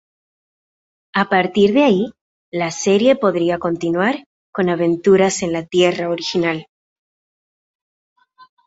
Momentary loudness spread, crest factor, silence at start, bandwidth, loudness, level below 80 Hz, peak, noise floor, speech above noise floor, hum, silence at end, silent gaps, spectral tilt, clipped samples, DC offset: 10 LU; 18 dB; 1.15 s; 8 kHz; -17 LUFS; -58 dBFS; -2 dBFS; under -90 dBFS; over 74 dB; none; 2.05 s; 2.21-2.52 s, 4.26-4.53 s; -5 dB/octave; under 0.1%; under 0.1%